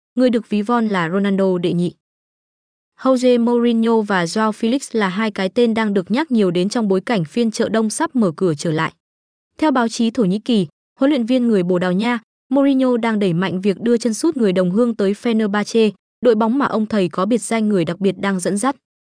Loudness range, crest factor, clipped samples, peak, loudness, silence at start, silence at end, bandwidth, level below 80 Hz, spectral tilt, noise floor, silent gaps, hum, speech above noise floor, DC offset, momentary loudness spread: 2 LU; 14 dB; under 0.1%; -4 dBFS; -18 LUFS; 0.15 s; 0.45 s; 10.5 kHz; -64 dBFS; -6 dB/octave; under -90 dBFS; 2.00-2.92 s, 9.00-9.51 s, 10.72-10.96 s, 12.23-12.50 s, 15.99-16.22 s; none; over 73 dB; under 0.1%; 4 LU